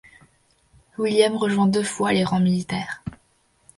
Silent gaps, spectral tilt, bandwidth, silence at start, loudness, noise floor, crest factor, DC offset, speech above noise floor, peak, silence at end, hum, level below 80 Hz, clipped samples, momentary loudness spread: none; -5.5 dB/octave; 11.5 kHz; 1 s; -21 LUFS; -63 dBFS; 18 dB; under 0.1%; 43 dB; -4 dBFS; 0.65 s; none; -56 dBFS; under 0.1%; 15 LU